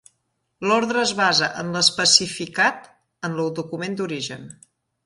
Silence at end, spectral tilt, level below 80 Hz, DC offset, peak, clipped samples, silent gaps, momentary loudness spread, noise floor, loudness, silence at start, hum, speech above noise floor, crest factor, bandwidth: 0.55 s; -2 dB/octave; -64 dBFS; under 0.1%; 0 dBFS; under 0.1%; none; 14 LU; -73 dBFS; -20 LUFS; 0.6 s; none; 51 dB; 22 dB; 11.5 kHz